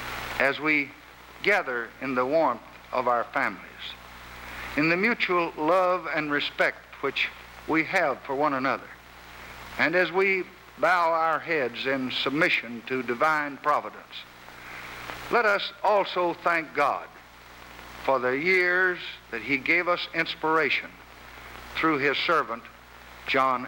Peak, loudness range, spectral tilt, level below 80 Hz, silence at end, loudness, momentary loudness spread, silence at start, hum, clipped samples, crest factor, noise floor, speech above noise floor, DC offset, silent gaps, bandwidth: -6 dBFS; 3 LU; -4.5 dB/octave; -58 dBFS; 0 s; -25 LUFS; 19 LU; 0 s; 60 Hz at -60 dBFS; under 0.1%; 20 dB; -48 dBFS; 23 dB; under 0.1%; none; 19 kHz